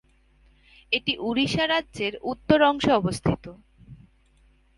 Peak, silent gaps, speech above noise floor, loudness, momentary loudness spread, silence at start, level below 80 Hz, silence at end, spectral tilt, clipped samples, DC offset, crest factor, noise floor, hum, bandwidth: -4 dBFS; none; 36 dB; -24 LUFS; 11 LU; 0.9 s; -50 dBFS; 0.85 s; -5.5 dB/octave; under 0.1%; under 0.1%; 24 dB; -60 dBFS; none; 11.5 kHz